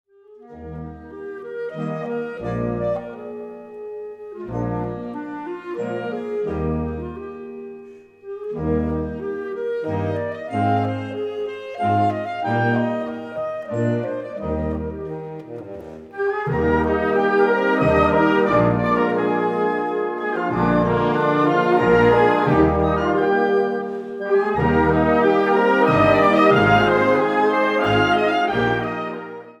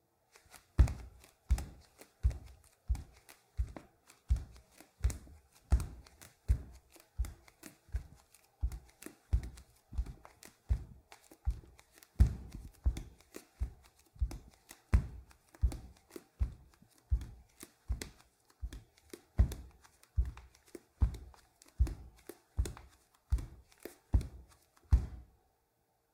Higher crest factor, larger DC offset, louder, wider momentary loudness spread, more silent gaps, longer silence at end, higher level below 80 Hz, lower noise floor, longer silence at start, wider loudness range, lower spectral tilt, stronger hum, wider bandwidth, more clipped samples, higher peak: second, 18 dB vs 26 dB; neither; first, -20 LUFS vs -39 LUFS; second, 18 LU vs 23 LU; neither; second, 0.1 s vs 0.95 s; about the same, -40 dBFS vs -40 dBFS; second, -45 dBFS vs -78 dBFS; second, 0.3 s vs 0.8 s; first, 12 LU vs 5 LU; about the same, -7.5 dB/octave vs -6.5 dB/octave; neither; second, 9 kHz vs 15 kHz; neither; first, -2 dBFS vs -12 dBFS